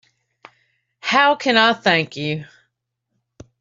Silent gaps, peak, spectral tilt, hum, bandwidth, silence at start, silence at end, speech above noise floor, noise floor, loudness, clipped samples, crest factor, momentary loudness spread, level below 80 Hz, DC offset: none; -2 dBFS; -4.5 dB/octave; none; 7.8 kHz; 1.05 s; 1.15 s; 58 dB; -75 dBFS; -17 LUFS; under 0.1%; 20 dB; 12 LU; -64 dBFS; under 0.1%